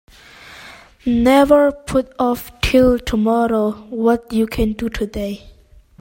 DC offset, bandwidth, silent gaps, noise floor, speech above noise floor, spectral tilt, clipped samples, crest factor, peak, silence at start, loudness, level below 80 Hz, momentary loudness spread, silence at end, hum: under 0.1%; 16.5 kHz; none; -41 dBFS; 25 dB; -6 dB/octave; under 0.1%; 16 dB; 0 dBFS; 0.5 s; -17 LUFS; -34 dBFS; 14 LU; 0.5 s; none